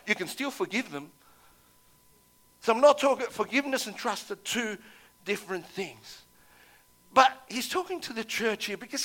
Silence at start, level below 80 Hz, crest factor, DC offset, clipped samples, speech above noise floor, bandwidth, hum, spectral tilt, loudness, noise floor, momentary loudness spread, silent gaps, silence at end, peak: 0.05 s; -72 dBFS; 24 dB; under 0.1%; under 0.1%; 33 dB; 17.5 kHz; 60 Hz at -75 dBFS; -2.5 dB/octave; -28 LUFS; -62 dBFS; 16 LU; none; 0 s; -6 dBFS